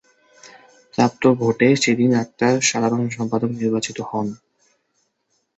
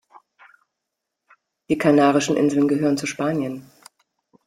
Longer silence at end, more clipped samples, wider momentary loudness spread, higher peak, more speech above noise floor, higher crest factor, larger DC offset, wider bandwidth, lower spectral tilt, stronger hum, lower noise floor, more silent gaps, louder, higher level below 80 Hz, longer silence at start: first, 1.25 s vs 0.85 s; neither; about the same, 9 LU vs 10 LU; first, -2 dBFS vs -6 dBFS; second, 51 dB vs 62 dB; about the same, 20 dB vs 18 dB; neither; second, 8.2 kHz vs 13.5 kHz; about the same, -4.5 dB/octave vs -5.5 dB/octave; neither; second, -70 dBFS vs -81 dBFS; neither; about the same, -19 LUFS vs -20 LUFS; about the same, -60 dBFS vs -64 dBFS; second, 0.45 s vs 1.7 s